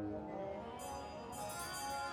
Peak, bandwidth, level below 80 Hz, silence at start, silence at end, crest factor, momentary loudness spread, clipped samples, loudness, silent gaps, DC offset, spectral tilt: -32 dBFS; over 20 kHz; -64 dBFS; 0 s; 0 s; 12 dB; 5 LU; under 0.1%; -45 LUFS; none; under 0.1%; -3.5 dB/octave